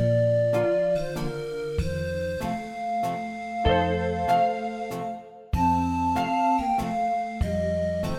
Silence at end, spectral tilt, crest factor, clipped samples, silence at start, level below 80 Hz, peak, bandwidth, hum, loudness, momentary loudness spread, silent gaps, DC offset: 0 s; -7 dB/octave; 16 dB; under 0.1%; 0 s; -40 dBFS; -10 dBFS; 16.5 kHz; none; -26 LUFS; 9 LU; none; under 0.1%